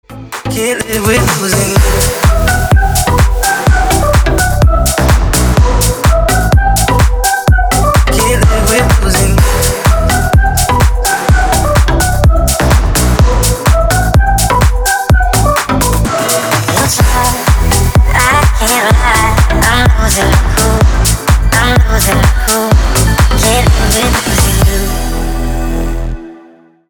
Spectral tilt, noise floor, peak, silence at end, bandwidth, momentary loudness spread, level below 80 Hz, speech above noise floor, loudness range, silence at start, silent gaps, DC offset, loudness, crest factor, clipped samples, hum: -4 dB/octave; -40 dBFS; 0 dBFS; 0.5 s; over 20 kHz; 3 LU; -12 dBFS; 30 dB; 1 LU; 0.1 s; none; 0.4%; -10 LUFS; 8 dB; under 0.1%; none